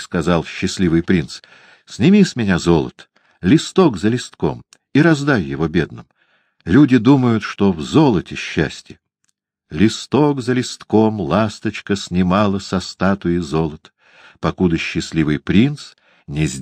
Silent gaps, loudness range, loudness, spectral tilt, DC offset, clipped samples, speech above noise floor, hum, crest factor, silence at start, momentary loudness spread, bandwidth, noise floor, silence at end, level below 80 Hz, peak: none; 3 LU; -17 LUFS; -6.5 dB/octave; under 0.1%; under 0.1%; 53 dB; none; 16 dB; 0 s; 11 LU; 10 kHz; -69 dBFS; 0 s; -42 dBFS; 0 dBFS